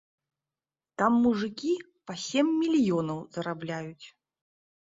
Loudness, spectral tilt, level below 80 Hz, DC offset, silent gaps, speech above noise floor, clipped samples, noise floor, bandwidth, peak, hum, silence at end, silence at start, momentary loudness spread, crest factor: -28 LUFS; -5.5 dB/octave; -68 dBFS; under 0.1%; none; over 63 dB; under 0.1%; under -90 dBFS; 7.8 kHz; -10 dBFS; none; 0.75 s; 1 s; 13 LU; 20 dB